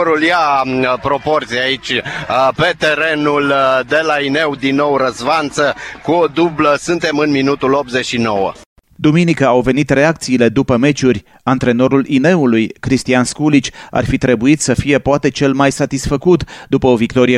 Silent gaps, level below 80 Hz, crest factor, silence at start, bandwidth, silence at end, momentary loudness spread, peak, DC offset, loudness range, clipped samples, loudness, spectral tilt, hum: 8.66-8.76 s; -40 dBFS; 14 dB; 0 s; 12.5 kHz; 0 s; 5 LU; 0 dBFS; under 0.1%; 2 LU; under 0.1%; -14 LUFS; -5.5 dB/octave; none